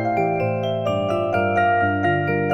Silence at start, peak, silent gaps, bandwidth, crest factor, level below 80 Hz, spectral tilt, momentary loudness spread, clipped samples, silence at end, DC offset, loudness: 0 s; -8 dBFS; none; 9.6 kHz; 14 dB; -50 dBFS; -8 dB/octave; 4 LU; under 0.1%; 0 s; under 0.1%; -20 LUFS